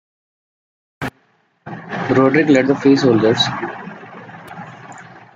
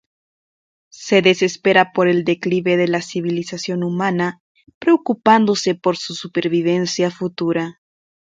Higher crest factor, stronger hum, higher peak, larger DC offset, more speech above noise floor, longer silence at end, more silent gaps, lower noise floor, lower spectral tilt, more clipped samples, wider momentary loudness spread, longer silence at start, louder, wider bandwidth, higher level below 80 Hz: about the same, 18 dB vs 18 dB; neither; about the same, -2 dBFS vs 0 dBFS; neither; second, 45 dB vs over 73 dB; second, 0.15 s vs 0.55 s; second, none vs 4.40-4.55 s, 4.74-4.81 s; second, -59 dBFS vs under -90 dBFS; about the same, -6 dB/octave vs -5 dB/octave; neither; first, 23 LU vs 9 LU; about the same, 1 s vs 0.95 s; first, -14 LUFS vs -18 LUFS; about the same, 7.8 kHz vs 7.8 kHz; first, -56 dBFS vs -64 dBFS